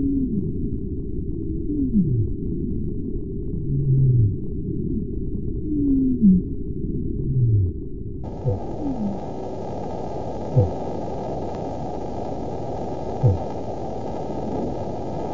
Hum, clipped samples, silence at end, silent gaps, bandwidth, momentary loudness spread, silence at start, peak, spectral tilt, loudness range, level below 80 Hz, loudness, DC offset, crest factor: none; under 0.1%; 0 s; none; 7.2 kHz; 10 LU; 0 s; -6 dBFS; -10.5 dB/octave; 5 LU; -34 dBFS; -25 LUFS; 2%; 18 dB